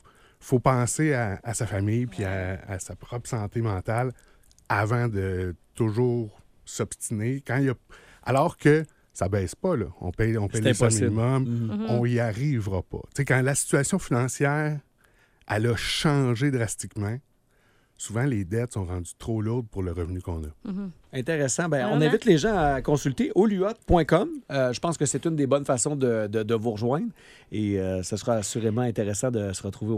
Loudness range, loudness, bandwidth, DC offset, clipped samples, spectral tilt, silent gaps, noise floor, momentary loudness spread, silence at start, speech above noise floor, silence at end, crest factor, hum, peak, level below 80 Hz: 6 LU; -26 LUFS; 15 kHz; under 0.1%; under 0.1%; -5.5 dB/octave; none; -63 dBFS; 11 LU; 0.4 s; 38 dB; 0 s; 20 dB; none; -6 dBFS; -48 dBFS